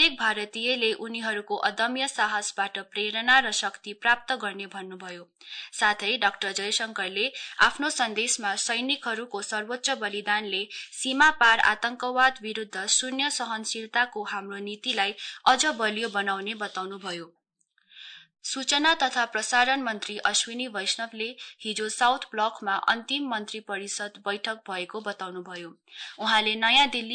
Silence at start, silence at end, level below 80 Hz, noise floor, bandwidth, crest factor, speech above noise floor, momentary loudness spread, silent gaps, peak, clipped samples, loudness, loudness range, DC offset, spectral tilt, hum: 0 s; 0 s; -64 dBFS; -71 dBFS; 9.6 kHz; 20 dB; 44 dB; 15 LU; none; -8 dBFS; under 0.1%; -26 LUFS; 5 LU; under 0.1%; -0.5 dB/octave; none